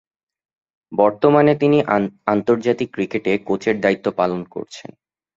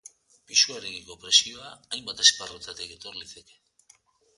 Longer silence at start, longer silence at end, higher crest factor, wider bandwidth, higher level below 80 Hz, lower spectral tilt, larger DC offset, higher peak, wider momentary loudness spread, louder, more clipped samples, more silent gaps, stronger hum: first, 0.9 s vs 0.5 s; second, 0.6 s vs 1 s; second, 18 dB vs 26 dB; second, 7.6 kHz vs 11.5 kHz; first, -58 dBFS vs -66 dBFS; first, -7 dB/octave vs 2 dB/octave; neither; about the same, -2 dBFS vs -2 dBFS; second, 13 LU vs 20 LU; first, -18 LUFS vs -21 LUFS; neither; neither; neither